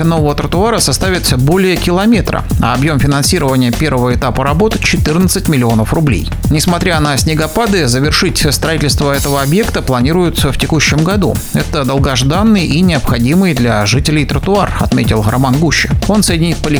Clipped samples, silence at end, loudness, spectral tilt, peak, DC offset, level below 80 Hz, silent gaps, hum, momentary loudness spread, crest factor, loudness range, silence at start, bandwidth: under 0.1%; 0 s; -11 LUFS; -5 dB/octave; 0 dBFS; under 0.1%; -22 dBFS; none; none; 3 LU; 10 dB; 1 LU; 0 s; over 20 kHz